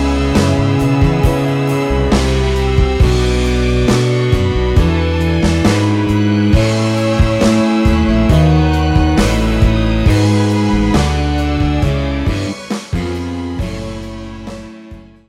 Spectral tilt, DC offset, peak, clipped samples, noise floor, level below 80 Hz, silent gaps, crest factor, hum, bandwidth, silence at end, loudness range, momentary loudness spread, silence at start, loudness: -6.5 dB/octave; under 0.1%; 0 dBFS; under 0.1%; -35 dBFS; -18 dBFS; none; 12 dB; none; 14.5 kHz; 0.3 s; 5 LU; 9 LU; 0 s; -14 LUFS